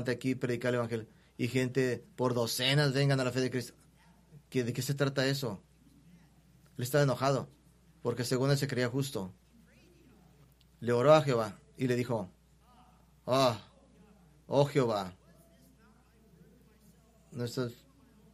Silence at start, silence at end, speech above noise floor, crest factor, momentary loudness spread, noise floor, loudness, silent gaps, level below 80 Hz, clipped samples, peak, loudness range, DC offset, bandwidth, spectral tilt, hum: 0 s; 0.6 s; 32 dB; 24 dB; 13 LU; -62 dBFS; -31 LUFS; none; -66 dBFS; under 0.1%; -10 dBFS; 5 LU; under 0.1%; 14.5 kHz; -5.5 dB/octave; none